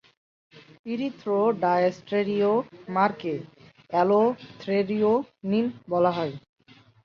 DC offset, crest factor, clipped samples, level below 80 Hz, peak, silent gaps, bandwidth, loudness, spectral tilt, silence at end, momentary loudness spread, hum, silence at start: under 0.1%; 18 dB; under 0.1%; -70 dBFS; -8 dBFS; 0.79-0.84 s; 6.8 kHz; -25 LUFS; -8 dB/octave; 0.65 s; 11 LU; none; 0.55 s